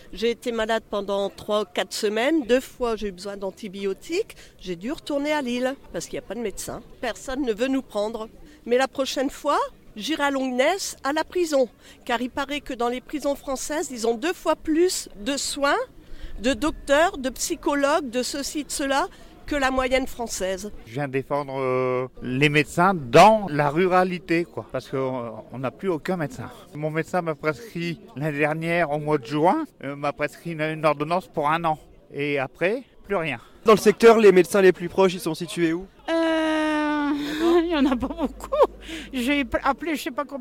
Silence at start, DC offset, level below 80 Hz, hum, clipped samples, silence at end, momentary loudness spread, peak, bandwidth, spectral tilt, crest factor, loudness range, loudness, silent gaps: 0.05 s; under 0.1%; -46 dBFS; none; under 0.1%; 0 s; 12 LU; -6 dBFS; 16.5 kHz; -4.5 dB/octave; 18 dB; 9 LU; -24 LUFS; none